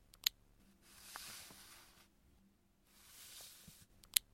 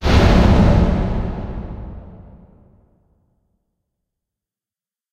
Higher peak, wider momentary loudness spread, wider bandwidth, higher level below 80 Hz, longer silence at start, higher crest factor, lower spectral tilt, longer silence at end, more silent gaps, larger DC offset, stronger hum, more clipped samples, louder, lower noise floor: about the same, -4 dBFS vs -2 dBFS; first, 25 LU vs 21 LU; first, 16.5 kHz vs 9.2 kHz; second, -74 dBFS vs -22 dBFS; first, 0.15 s vs 0 s; first, 44 dB vs 16 dB; second, 1.5 dB/octave vs -7.5 dB/octave; second, 0.1 s vs 2.95 s; neither; neither; neither; neither; second, -44 LUFS vs -16 LUFS; second, -73 dBFS vs under -90 dBFS